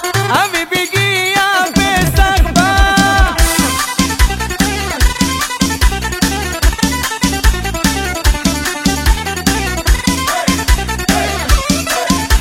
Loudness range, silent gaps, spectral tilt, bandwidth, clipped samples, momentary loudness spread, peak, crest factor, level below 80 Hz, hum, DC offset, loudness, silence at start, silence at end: 3 LU; none; -3.5 dB/octave; 17 kHz; under 0.1%; 4 LU; 0 dBFS; 12 dB; -18 dBFS; none; under 0.1%; -13 LUFS; 0 s; 0 s